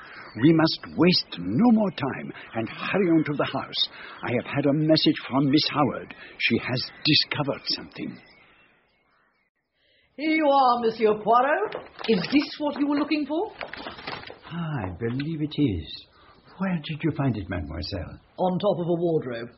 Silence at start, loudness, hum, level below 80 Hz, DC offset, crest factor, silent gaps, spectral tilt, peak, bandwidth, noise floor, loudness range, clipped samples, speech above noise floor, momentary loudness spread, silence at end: 0 s; -24 LUFS; none; -54 dBFS; under 0.1%; 18 dB; 9.49-9.55 s; -4 dB/octave; -6 dBFS; 6 kHz; -66 dBFS; 7 LU; under 0.1%; 42 dB; 15 LU; 0.1 s